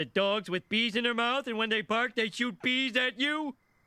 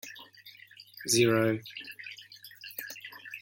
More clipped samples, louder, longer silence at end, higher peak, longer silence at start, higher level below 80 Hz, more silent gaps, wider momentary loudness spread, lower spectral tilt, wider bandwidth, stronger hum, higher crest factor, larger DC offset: neither; about the same, -29 LUFS vs -29 LUFS; first, 0.35 s vs 0.05 s; about the same, -14 dBFS vs -14 dBFS; about the same, 0 s vs 0.05 s; about the same, -74 dBFS vs -72 dBFS; neither; second, 4 LU vs 25 LU; about the same, -4 dB/octave vs -4 dB/octave; second, 14 kHz vs 17 kHz; neither; about the same, 16 dB vs 20 dB; neither